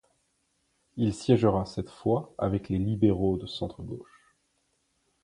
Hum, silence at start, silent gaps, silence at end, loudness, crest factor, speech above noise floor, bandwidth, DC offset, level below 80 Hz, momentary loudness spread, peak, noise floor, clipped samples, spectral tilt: none; 0.95 s; none; 1.2 s; -28 LUFS; 22 dB; 47 dB; 11 kHz; under 0.1%; -50 dBFS; 16 LU; -8 dBFS; -74 dBFS; under 0.1%; -8 dB/octave